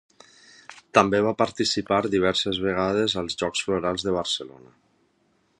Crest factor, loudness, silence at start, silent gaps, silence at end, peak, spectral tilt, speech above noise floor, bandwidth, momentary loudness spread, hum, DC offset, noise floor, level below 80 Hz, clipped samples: 24 dB; -24 LUFS; 0.7 s; none; 1.1 s; 0 dBFS; -4 dB/octave; 43 dB; 11.5 kHz; 6 LU; none; under 0.1%; -67 dBFS; -54 dBFS; under 0.1%